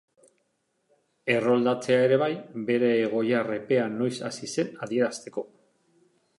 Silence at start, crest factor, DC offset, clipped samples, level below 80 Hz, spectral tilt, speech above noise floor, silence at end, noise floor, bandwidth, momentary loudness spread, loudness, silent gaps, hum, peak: 1.25 s; 18 dB; under 0.1%; under 0.1%; -76 dBFS; -5.5 dB/octave; 49 dB; 0.9 s; -74 dBFS; 11.5 kHz; 12 LU; -26 LUFS; none; none; -10 dBFS